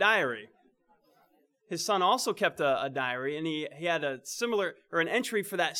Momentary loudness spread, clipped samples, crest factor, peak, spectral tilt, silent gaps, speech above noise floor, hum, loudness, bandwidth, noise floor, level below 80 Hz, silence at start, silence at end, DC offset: 8 LU; under 0.1%; 20 dB; -10 dBFS; -3 dB/octave; none; 38 dB; none; -30 LUFS; 19 kHz; -68 dBFS; -82 dBFS; 0 s; 0 s; under 0.1%